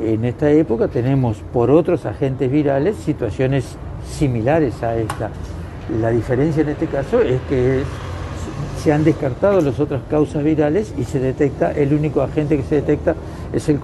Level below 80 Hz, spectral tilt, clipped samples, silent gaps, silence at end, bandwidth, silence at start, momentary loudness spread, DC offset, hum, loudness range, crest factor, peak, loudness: -36 dBFS; -8 dB/octave; under 0.1%; none; 0 s; 12 kHz; 0 s; 11 LU; under 0.1%; none; 3 LU; 16 dB; -2 dBFS; -18 LUFS